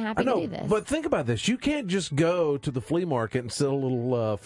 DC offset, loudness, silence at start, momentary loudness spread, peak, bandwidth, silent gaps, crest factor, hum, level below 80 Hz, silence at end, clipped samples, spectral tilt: under 0.1%; -27 LUFS; 0 s; 3 LU; -10 dBFS; 11.5 kHz; none; 16 dB; none; -54 dBFS; 0 s; under 0.1%; -5.5 dB/octave